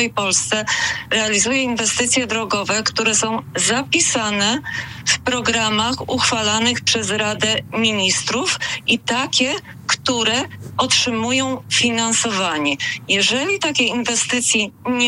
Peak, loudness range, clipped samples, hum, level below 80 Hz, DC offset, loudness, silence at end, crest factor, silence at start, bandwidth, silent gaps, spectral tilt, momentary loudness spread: -8 dBFS; 1 LU; under 0.1%; none; -54 dBFS; under 0.1%; -17 LUFS; 0 s; 12 dB; 0 s; 16 kHz; none; -1.5 dB/octave; 4 LU